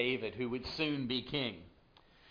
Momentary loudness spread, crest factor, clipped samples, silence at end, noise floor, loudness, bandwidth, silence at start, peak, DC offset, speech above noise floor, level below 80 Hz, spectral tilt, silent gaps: 5 LU; 18 dB; under 0.1%; 0 s; -64 dBFS; -36 LUFS; 5.2 kHz; 0 s; -20 dBFS; under 0.1%; 28 dB; -62 dBFS; -6.5 dB/octave; none